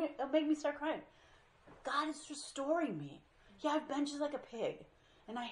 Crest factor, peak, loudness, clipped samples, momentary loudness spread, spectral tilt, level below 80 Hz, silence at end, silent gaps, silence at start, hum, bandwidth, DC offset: 20 dB; -20 dBFS; -39 LUFS; under 0.1%; 12 LU; -4 dB/octave; -74 dBFS; 0 s; none; 0 s; none; 11 kHz; under 0.1%